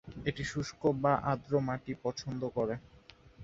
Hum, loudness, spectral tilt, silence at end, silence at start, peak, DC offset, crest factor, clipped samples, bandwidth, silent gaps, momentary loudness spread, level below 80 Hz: none; -34 LUFS; -6.5 dB/octave; 0 s; 0.05 s; -14 dBFS; under 0.1%; 20 dB; under 0.1%; 7.8 kHz; none; 8 LU; -58 dBFS